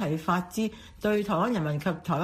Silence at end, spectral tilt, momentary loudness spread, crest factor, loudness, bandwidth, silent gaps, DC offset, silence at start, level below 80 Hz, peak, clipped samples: 0 s; -6.5 dB/octave; 6 LU; 16 dB; -29 LUFS; 15.5 kHz; none; under 0.1%; 0 s; -56 dBFS; -12 dBFS; under 0.1%